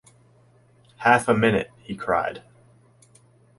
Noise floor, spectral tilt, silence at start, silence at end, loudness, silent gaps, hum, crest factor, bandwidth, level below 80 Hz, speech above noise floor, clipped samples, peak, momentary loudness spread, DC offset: -57 dBFS; -5.5 dB/octave; 1 s; 1.2 s; -22 LUFS; none; none; 22 dB; 11.5 kHz; -56 dBFS; 35 dB; under 0.1%; -4 dBFS; 15 LU; under 0.1%